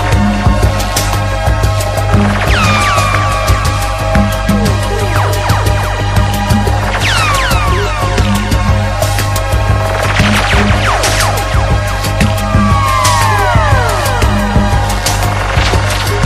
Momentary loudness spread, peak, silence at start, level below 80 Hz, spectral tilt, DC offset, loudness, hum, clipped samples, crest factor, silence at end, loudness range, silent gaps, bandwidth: 4 LU; 0 dBFS; 0 s; -16 dBFS; -4.5 dB/octave; under 0.1%; -11 LUFS; none; under 0.1%; 10 dB; 0 s; 1 LU; none; 15.5 kHz